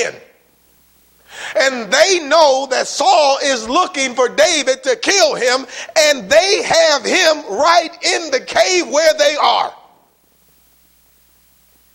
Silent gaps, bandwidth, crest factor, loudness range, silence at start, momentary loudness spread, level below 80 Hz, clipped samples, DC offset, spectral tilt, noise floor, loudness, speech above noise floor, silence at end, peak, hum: none; 16.5 kHz; 16 dB; 3 LU; 0 s; 6 LU; -56 dBFS; under 0.1%; under 0.1%; -0.5 dB/octave; -55 dBFS; -13 LUFS; 41 dB; 2.2 s; 0 dBFS; none